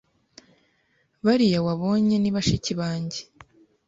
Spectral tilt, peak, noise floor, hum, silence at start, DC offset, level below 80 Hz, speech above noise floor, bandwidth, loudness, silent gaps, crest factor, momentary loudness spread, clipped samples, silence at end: -6 dB/octave; -8 dBFS; -67 dBFS; none; 1.25 s; under 0.1%; -50 dBFS; 45 dB; 7.8 kHz; -23 LUFS; none; 16 dB; 10 LU; under 0.1%; 0.65 s